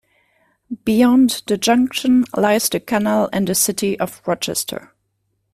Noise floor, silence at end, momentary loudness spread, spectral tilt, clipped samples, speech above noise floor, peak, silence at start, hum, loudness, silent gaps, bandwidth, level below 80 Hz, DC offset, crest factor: -69 dBFS; 0.75 s; 9 LU; -4 dB/octave; under 0.1%; 52 dB; -2 dBFS; 0.7 s; none; -17 LUFS; none; 15.5 kHz; -54 dBFS; under 0.1%; 16 dB